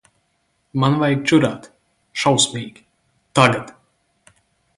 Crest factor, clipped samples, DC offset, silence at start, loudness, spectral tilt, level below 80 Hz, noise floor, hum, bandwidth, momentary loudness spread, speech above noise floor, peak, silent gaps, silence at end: 20 dB; under 0.1%; under 0.1%; 0.75 s; -18 LUFS; -4.5 dB/octave; -58 dBFS; -67 dBFS; none; 11.5 kHz; 17 LU; 50 dB; 0 dBFS; none; 1.1 s